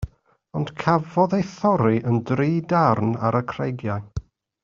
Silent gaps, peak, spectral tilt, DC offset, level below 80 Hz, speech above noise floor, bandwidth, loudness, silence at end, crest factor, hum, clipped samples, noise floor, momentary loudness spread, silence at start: none; -4 dBFS; -7.5 dB/octave; under 0.1%; -46 dBFS; 27 dB; 7.4 kHz; -22 LUFS; 0.4 s; 20 dB; none; under 0.1%; -48 dBFS; 11 LU; 0 s